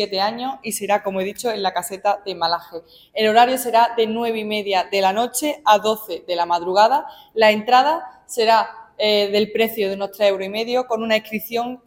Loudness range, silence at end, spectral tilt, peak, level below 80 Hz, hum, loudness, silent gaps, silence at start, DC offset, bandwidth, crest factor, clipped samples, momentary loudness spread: 3 LU; 0.1 s; -3 dB/octave; -2 dBFS; -64 dBFS; none; -19 LUFS; none; 0 s; under 0.1%; 17 kHz; 18 dB; under 0.1%; 10 LU